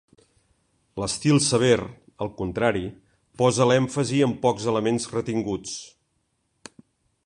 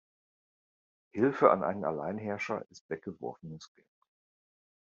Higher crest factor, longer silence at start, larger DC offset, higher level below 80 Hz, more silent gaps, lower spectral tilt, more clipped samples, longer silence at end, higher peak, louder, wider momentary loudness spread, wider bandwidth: second, 20 dB vs 28 dB; second, 0.95 s vs 1.15 s; neither; first, -54 dBFS vs -76 dBFS; second, none vs 2.81-2.89 s; about the same, -5 dB/octave vs -6 dB/octave; neither; about the same, 1.4 s vs 1.3 s; about the same, -4 dBFS vs -6 dBFS; first, -23 LUFS vs -31 LUFS; second, 14 LU vs 19 LU; first, 11.5 kHz vs 7.4 kHz